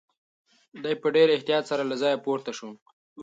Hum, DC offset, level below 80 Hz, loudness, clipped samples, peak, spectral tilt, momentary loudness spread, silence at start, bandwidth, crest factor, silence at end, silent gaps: none; under 0.1%; -80 dBFS; -25 LUFS; under 0.1%; -8 dBFS; -4.5 dB/octave; 16 LU; 0.75 s; 7.8 kHz; 18 dB; 0 s; 2.82-2.86 s, 2.93-3.16 s